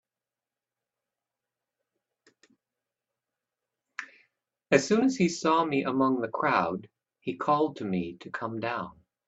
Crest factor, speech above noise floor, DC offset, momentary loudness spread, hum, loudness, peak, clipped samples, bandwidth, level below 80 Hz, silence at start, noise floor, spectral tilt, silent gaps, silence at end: 24 dB; over 63 dB; under 0.1%; 18 LU; none; -28 LUFS; -6 dBFS; under 0.1%; 8.2 kHz; -70 dBFS; 4 s; under -90 dBFS; -5.5 dB/octave; none; 0.35 s